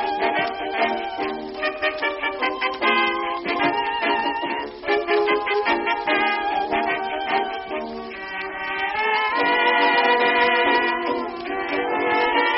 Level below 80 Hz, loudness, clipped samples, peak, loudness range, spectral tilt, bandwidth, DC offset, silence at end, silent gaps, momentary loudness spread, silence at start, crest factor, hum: -56 dBFS; -21 LUFS; under 0.1%; -6 dBFS; 4 LU; 0.5 dB/octave; 5.8 kHz; under 0.1%; 0 s; none; 10 LU; 0 s; 16 dB; none